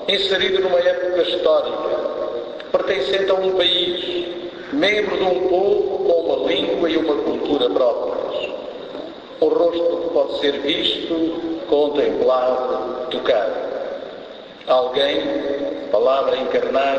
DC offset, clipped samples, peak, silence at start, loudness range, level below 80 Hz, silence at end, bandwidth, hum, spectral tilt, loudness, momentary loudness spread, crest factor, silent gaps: under 0.1%; under 0.1%; -4 dBFS; 0 s; 2 LU; -54 dBFS; 0 s; 8 kHz; none; -4.5 dB/octave; -19 LUFS; 10 LU; 16 dB; none